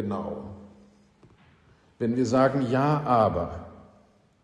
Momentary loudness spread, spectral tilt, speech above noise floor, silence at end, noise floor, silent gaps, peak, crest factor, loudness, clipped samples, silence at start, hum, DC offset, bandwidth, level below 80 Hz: 20 LU; -7.5 dB/octave; 35 dB; 0.6 s; -60 dBFS; none; -8 dBFS; 18 dB; -25 LUFS; under 0.1%; 0 s; none; under 0.1%; 10 kHz; -52 dBFS